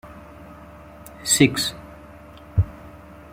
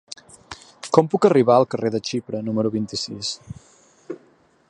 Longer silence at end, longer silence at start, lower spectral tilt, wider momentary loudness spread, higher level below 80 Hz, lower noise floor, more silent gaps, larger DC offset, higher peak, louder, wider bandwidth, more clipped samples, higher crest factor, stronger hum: second, 0.35 s vs 0.55 s; second, 0.05 s vs 0.5 s; second, -3.5 dB/octave vs -5.5 dB/octave; first, 27 LU vs 24 LU; first, -42 dBFS vs -60 dBFS; second, -43 dBFS vs -57 dBFS; neither; neither; about the same, -2 dBFS vs 0 dBFS; about the same, -21 LUFS vs -20 LUFS; first, 16.5 kHz vs 11 kHz; neither; about the same, 24 dB vs 22 dB; neither